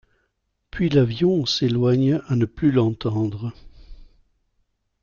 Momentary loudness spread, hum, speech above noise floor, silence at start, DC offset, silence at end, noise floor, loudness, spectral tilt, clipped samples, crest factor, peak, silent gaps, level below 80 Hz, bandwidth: 8 LU; none; 53 dB; 0.75 s; under 0.1%; 1 s; -73 dBFS; -21 LUFS; -7 dB/octave; under 0.1%; 16 dB; -6 dBFS; none; -48 dBFS; 7.2 kHz